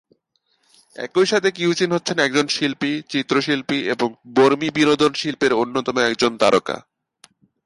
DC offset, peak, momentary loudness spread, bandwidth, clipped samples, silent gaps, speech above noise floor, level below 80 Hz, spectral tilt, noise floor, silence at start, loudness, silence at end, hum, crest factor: under 0.1%; -2 dBFS; 7 LU; 11.5 kHz; under 0.1%; none; 49 dB; -62 dBFS; -4 dB/octave; -68 dBFS; 1 s; -19 LUFS; 0.85 s; none; 18 dB